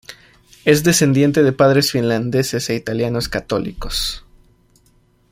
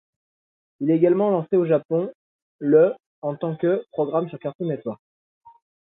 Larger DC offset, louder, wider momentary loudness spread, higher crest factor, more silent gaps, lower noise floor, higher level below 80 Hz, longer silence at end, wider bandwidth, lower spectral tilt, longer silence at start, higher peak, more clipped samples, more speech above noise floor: neither; first, -17 LUFS vs -22 LUFS; second, 10 LU vs 13 LU; about the same, 18 dB vs 18 dB; second, none vs 1.85-1.89 s, 2.15-2.59 s, 3.06-3.22 s, 4.55-4.59 s; second, -56 dBFS vs under -90 dBFS; first, -38 dBFS vs -72 dBFS; first, 1.15 s vs 1 s; first, 16.5 kHz vs 3.9 kHz; second, -4.5 dB/octave vs -12.5 dB/octave; second, 0.1 s vs 0.8 s; first, 0 dBFS vs -6 dBFS; neither; second, 40 dB vs over 69 dB